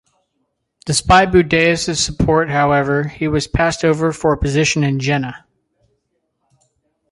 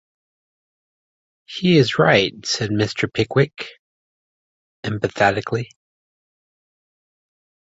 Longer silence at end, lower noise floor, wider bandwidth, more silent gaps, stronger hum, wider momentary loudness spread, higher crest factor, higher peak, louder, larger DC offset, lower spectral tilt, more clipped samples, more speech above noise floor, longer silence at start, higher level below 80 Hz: second, 1.75 s vs 2 s; second, -70 dBFS vs under -90 dBFS; first, 11.5 kHz vs 8 kHz; second, none vs 3.79-4.83 s; neither; second, 7 LU vs 18 LU; second, 16 dB vs 22 dB; about the same, 0 dBFS vs -2 dBFS; first, -15 LUFS vs -19 LUFS; neither; about the same, -4.5 dB/octave vs -5.5 dB/octave; neither; second, 55 dB vs over 71 dB; second, 0.85 s vs 1.5 s; first, -34 dBFS vs -54 dBFS